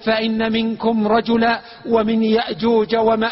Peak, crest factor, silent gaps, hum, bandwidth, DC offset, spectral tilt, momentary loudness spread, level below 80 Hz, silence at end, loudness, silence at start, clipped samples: -4 dBFS; 14 dB; none; none; 5.8 kHz; under 0.1%; -9.5 dB/octave; 3 LU; -50 dBFS; 0 s; -18 LUFS; 0 s; under 0.1%